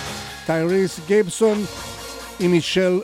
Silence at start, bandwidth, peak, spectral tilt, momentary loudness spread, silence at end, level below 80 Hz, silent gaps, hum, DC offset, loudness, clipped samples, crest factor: 0 s; 16.5 kHz; -6 dBFS; -5 dB/octave; 14 LU; 0 s; -50 dBFS; none; none; under 0.1%; -20 LUFS; under 0.1%; 14 dB